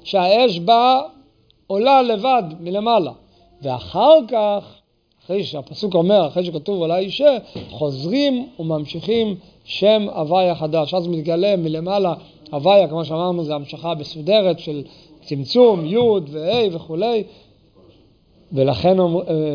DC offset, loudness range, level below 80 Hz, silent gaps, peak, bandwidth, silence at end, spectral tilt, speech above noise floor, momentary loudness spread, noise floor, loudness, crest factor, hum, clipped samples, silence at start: under 0.1%; 3 LU; -56 dBFS; none; 0 dBFS; 5.2 kHz; 0 s; -7.5 dB/octave; 37 dB; 13 LU; -54 dBFS; -18 LUFS; 18 dB; none; under 0.1%; 0.05 s